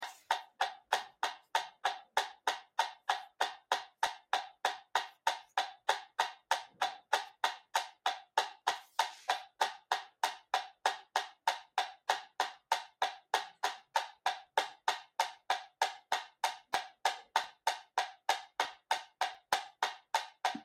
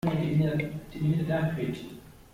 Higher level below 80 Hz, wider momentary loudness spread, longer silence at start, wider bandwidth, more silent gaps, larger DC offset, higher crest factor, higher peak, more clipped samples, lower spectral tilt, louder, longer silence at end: second, -88 dBFS vs -52 dBFS; second, 4 LU vs 14 LU; about the same, 0 s vs 0.05 s; about the same, 16 kHz vs 15 kHz; neither; neither; first, 24 dB vs 16 dB; about the same, -12 dBFS vs -14 dBFS; neither; second, 1.5 dB/octave vs -8.5 dB/octave; second, -37 LUFS vs -29 LUFS; about the same, 0 s vs 0.1 s